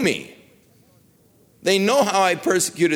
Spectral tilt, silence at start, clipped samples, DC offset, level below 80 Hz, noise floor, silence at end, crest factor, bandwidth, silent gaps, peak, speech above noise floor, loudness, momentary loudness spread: -3.5 dB/octave; 0 s; under 0.1%; under 0.1%; -64 dBFS; -56 dBFS; 0 s; 16 dB; 19 kHz; none; -6 dBFS; 37 dB; -19 LUFS; 8 LU